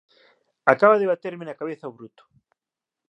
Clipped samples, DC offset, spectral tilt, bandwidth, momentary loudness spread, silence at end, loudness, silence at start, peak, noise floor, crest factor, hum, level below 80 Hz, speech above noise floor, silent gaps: under 0.1%; under 0.1%; -7.5 dB/octave; 7.4 kHz; 18 LU; 1 s; -21 LUFS; 0.65 s; 0 dBFS; -89 dBFS; 24 dB; none; -78 dBFS; 67 dB; none